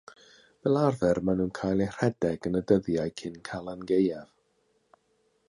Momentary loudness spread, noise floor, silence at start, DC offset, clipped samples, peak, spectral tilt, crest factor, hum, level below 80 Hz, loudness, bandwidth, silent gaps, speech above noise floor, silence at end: 12 LU; -71 dBFS; 0.65 s; under 0.1%; under 0.1%; -10 dBFS; -7.5 dB/octave; 20 dB; none; -56 dBFS; -28 LUFS; 11 kHz; none; 44 dB; 1.25 s